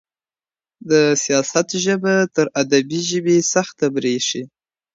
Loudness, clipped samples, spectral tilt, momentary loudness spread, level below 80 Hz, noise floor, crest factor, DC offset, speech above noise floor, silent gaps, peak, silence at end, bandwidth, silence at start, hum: -18 LUFS; under 0.1%; -3.5 dB/octave; 5 LU; -66 dBFS; under -90 dBFS; 18 dB; under 0.1%; over 72 dB; none; -2 dBFS; 0.5 s; 8 kHz; 0.85 s; none